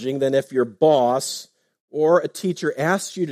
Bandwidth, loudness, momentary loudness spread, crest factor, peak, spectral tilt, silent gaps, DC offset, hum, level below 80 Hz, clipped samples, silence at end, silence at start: 15.5 kHz; -20 LUFS; 10 LU; 16 dB; -4 dBFS; -5 dB/octave; 1.80-1.88 s; under 0.1%; none; -70 dBFS; under 0.1%; 0 s; 0 s